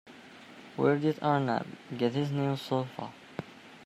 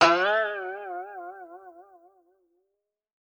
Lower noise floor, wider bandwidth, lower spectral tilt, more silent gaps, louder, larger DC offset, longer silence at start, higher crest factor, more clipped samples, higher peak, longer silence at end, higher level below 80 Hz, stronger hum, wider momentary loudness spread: second, -51 dBFS vs -81 dBFS; first, 14 kHz vs 9.6 kHz; first, -7.5 dB/octave vs -3 dB/octave; neither; second, -31 LUFS vs -27 LUFS; neither; about the same, 0.05 s vs 0 s; about the same, 20 dB vs 22 dB; neither; second, -12 dBFS vs -6 dBFS; second, 0 s vs 1.45 s; about the same, -74 dBFS vs -74 dBFS; neither; about the same, 22 LU vs 23 LU